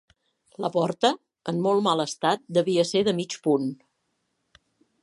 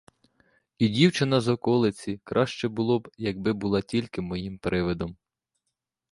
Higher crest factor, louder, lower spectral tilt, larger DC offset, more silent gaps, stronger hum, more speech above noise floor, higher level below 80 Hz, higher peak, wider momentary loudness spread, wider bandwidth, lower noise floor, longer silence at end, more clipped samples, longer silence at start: about the same, 20 dB vs 20 dB; about the same, -25 LUFS vs -26 LUFS; second, -5 dB/octave vs -6.5 dB/octave; neither; neither; neither; second, 51 dB vs 57 dB; second, -72 dBFS vs -52 dBFS; about the same, -6 dBFS vs -6 dBFS; second, 8 LU vs 11 LU; about the same, 11.5 kHz vs 11.5 kHz; second, -75 dBFS vs -83 dBFS; first, 1.3 s vs 1 s; neither; second, 0.6 s vs 0.8 s